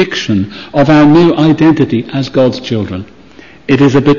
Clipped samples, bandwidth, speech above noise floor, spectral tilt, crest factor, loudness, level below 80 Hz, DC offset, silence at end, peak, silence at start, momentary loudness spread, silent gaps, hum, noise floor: under 0.1%; 7.4 kHz; 28 dB; -7 dB/octave; 10 dB; -10 LUFS; -40 dBFS; under 0.1%; 0 s; 0 dBFS; 0 s; 11 LU; none; none; -37 dBFS